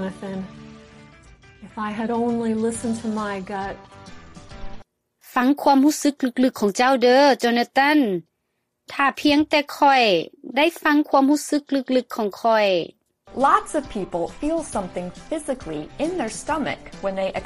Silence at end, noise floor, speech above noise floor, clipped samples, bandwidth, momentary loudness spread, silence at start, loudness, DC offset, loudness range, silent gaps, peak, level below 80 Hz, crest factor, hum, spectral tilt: 0 s; -75 dBFS; 54 dB; under 0.1%; 15.5 kHz; 15 LU; 0 s; -21 LUFS; under 0.1%; 8 LU; none; -2 dBFS; -48 dBFS; 20 dB; none; -4 dB/octave